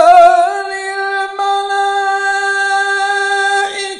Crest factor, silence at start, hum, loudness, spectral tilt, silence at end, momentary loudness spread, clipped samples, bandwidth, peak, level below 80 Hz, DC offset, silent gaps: 12 dB; 0 s; none; -13 LUFS; 0.5 dB/octave; 0 s; 9 LU; 0.8%; 11 kHz; 0 dBFS; -58 dBFS; under 0.1%; none